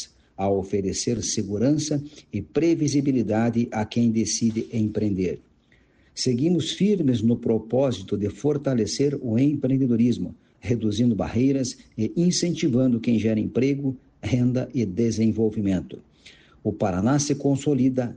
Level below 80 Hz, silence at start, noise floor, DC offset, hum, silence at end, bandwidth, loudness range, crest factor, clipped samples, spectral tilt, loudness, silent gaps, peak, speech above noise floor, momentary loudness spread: -54 dBFS; 0 s; -59 dBFS; under 0.1%; none; 0 s; 10 kHz; 2 LU; 14 dB; under 0.1%; -6 dB/octave; -24 LUFS; none; -10 dBFS; 37 dB; 8 LU